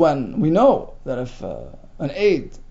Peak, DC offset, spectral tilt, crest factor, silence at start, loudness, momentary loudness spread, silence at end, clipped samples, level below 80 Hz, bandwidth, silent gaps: -4 dBFS; under 0.1%; -7.5 dB/octave; 16 dB; 0 s; -20 LUFS; 16 LU; 0 s; under 0.1%; -40 dBFS; 7.8 kHz; none